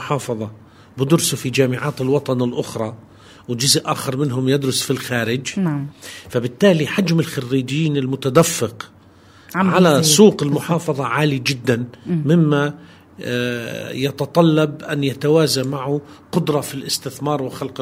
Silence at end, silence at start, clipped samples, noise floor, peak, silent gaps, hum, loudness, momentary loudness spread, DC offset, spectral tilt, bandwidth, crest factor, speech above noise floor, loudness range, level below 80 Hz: 0 s; 0 s; under 0.1%; -47 dBFS; 0 dBFS; none; none; -18 LUFS; 12 LU; under 0.1%; -5 dB/octave; 16 kHz; 18 dB; 29 dB; 4 LU; -58 dBFS